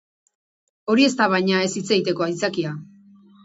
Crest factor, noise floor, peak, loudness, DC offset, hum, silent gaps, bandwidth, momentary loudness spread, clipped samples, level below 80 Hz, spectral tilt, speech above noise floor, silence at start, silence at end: 20 dB; -50 dBFS; -2 dBFS; -20 LUFS; under 0.1%; none; none; 8 kHz; 12 LU; under 0.1%; -68 dBFS; -4.5 dB/octave; 30 dB; 0.85 s; 0.6 s